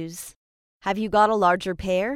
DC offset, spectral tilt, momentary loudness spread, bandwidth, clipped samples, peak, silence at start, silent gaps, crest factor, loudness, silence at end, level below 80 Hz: under 0.1%; -5 dB/octave; 18 LU; 16.5 kHz; under 0.1%; -6 dBFS; 0 s; 0.36-0.80 s; 18 dB; -22 LUFS; 0 s; -48 dBFS